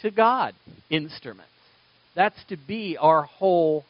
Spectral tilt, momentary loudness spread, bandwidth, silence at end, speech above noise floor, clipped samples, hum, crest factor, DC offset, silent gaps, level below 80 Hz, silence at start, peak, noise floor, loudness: -3.5 dB/octave; 18 LU; 5.6 kHz; 0.1 s; 36 dB; under 0.1%; none; 20 dB; under 0.1%; none; -70 dBFS; 0.05 s; -4 dBFS; -59 dBFS; -23 LUFS